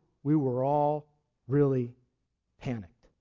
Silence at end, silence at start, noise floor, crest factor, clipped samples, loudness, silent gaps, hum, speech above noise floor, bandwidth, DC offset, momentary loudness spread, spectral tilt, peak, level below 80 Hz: 0.35 s; 0.25 s; -80 dBFS; 16 dB; under 0.1%; -29 LUFS; none; none; 52 dB; 6.8 kHz; under 0.1%; 13 LU; -10.5 dB/octave; -14 dBFS; -62 dBFS